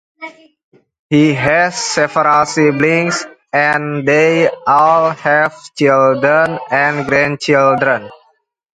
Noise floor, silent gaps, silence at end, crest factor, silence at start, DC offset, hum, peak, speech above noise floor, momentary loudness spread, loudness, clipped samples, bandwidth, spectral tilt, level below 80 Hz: -58 dBFS; 0.63-0.72 s, 0.99-1.09 s; 0.6 s; 14 dB; 0.2 s; under 0.1%; none; 0 dBFS; 46 dB; 6 LU; -13 LUFS; under 0.1%; 10.5 kHz; -5 dB/octave; -54 dBFS